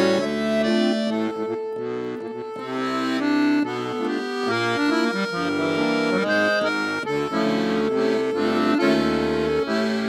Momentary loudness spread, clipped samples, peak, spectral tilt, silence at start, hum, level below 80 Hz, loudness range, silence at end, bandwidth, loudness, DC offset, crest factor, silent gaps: 8 LU; under 0.1%; -8 dBFS; -5 dB/octave; 0 s; none; -54 dBFS; 3 LU; 0 s; 13.5 kHz; -22 LUFS; under 0.1%; 14 dB; none